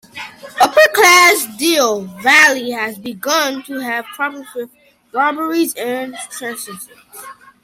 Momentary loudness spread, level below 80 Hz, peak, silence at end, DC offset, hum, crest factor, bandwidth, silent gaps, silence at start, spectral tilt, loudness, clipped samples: 22 LU; -64 dBFS; 0 dBFS; 0.3 s; under 0.1%; none; 16 dB; 16.5 kHz; none; 0.15 s; -1 dB/octave; -13 LUFS; under 0.1%